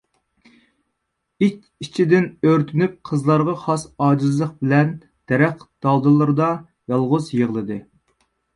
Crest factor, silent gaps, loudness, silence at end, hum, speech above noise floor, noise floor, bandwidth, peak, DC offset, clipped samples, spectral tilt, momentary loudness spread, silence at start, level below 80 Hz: 18 dB; none; -19 LUFS; 0.75 s; none; 57 dB; -76 dBFS; 11 kHz; -2 dBFS; under 0.1%; under 0.1%; -8 dB/octave; 9 LU; 1.4 s; -60 dBFS